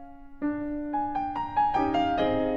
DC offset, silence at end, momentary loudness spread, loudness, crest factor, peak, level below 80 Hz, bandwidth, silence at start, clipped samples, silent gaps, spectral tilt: under 0.1%; 0 s; 7 LU; -28 LUFS; 14 dB; -14 dBFS; -48 dBFS; 7.2 kHz; 0 s; under 0.1%; none; -7 dB/octave